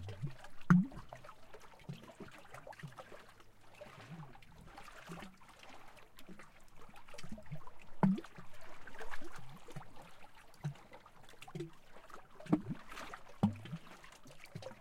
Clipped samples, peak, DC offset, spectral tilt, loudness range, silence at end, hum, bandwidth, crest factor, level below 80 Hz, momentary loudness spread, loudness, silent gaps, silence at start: under 0.1%; -14 dBFS; under 0.1%; -7.5 dB/octave; 15 LU; 0 s; none; 14.5 kHz; 26 dB; -62 dBFS; 23 LU; -41 LUFS; none; 0 s